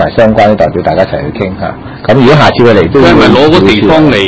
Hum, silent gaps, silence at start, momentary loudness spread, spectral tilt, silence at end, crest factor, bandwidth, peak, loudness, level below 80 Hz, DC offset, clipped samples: none; none; 0 s; 11 LU; -7 dB/octave; 0 s; 6 dB; 8 kHz; 0 dBFS; -6 LUFS; -28 dBFS; under 0.1%; 9%